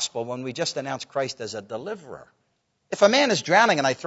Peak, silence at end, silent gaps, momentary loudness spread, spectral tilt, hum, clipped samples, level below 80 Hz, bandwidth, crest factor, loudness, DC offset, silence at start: -4 dBFS; 0 s; none; 17 LU; -3 dB/octave; none; under 0.1%; -72 dBFS; 8 kHz; 22 dB; -23 LUFS; under 0.1%; 0 s